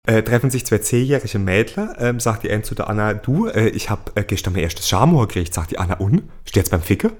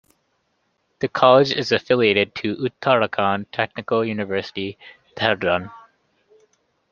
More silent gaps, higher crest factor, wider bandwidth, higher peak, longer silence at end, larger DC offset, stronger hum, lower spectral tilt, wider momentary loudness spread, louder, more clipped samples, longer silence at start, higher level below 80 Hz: neither; about the same, 18 dB vs 20 dB; first, 19 kHz vs 7.2 kHz; about the same, 0 dBFS vs -2 dBFS; second, 0 s vs 1.15 s; neither; neither; about the same, -5.5 dB/octave vs -5.5 dB/octave; second, 7 LU vs 13 LU; about the same, -19 LUFS vs -20 LUFS; neither; second, 0.05 s vs 1 s; first, -34 dBFS vs -62 dBFS